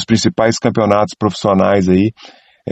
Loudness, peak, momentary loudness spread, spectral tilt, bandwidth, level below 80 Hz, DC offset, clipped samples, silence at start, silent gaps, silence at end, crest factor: -14 LUFS; 0 dBFS; 5 LU; -6 dB/octave; 8.6 kHz; -48 dBFS; under 0.1%; under 0.1%; 0 s; none; 0 s; 14 dB